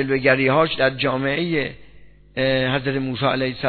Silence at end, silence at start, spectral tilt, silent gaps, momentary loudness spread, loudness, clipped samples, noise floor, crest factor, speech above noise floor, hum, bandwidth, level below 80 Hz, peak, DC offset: 0 s; 0 s; -9.5 dB/octave; none; 7 LU; -20 LUFS; under 0.1%; -46 dBFS; 18 dB; 26 dB; none; 4.6 kHz; -50 dBFS; -2 dBFS; under 0.1%